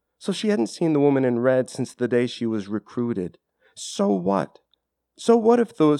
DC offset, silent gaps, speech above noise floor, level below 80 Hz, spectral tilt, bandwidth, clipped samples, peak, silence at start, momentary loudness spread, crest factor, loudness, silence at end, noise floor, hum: under 0.1%; none; 50 dB; -68 dBFS; -6 dB/octave; 12 kHz; under 0.1%; -6 dBFS; 0.2 s; 11 LU; 18 dB; -22 LUFS; 0 s; -72 dBFS; none